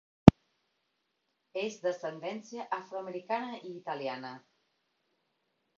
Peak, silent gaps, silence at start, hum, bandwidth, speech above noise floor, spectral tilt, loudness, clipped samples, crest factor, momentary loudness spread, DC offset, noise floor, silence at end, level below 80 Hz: 0 dBFS; none; 0.25 s; none; 7.4 kHz; 43 dB; -7 dB/octave; -30 LUFS; under 0.1%; 32 dB; 21 LU; under 0.1%; -80 dBFS; 1.4 s; -48 dBFS